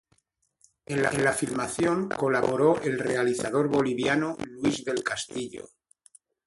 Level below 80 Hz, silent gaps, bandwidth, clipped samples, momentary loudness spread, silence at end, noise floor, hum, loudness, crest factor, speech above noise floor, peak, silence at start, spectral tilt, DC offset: -60 dBFS; none; 12 kHz; under 0.1%; 9 LU; 0.85 s; -72 dBFS; none; -26 LUFS; 18 dB; 45 dB; -8 dBFS; 0.9 s; -5 dB/octave; under 0.1%